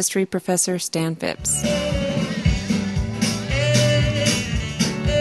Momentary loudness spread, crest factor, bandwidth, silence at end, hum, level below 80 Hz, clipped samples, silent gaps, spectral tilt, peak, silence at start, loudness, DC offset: 6 LU; 16 dB; 13 kHz; 0 s; none; -32 dBFS; under 0.1%; none; -4 dB/octave; -4 dBFS; 0 s; -21 LUFS; under 0.1%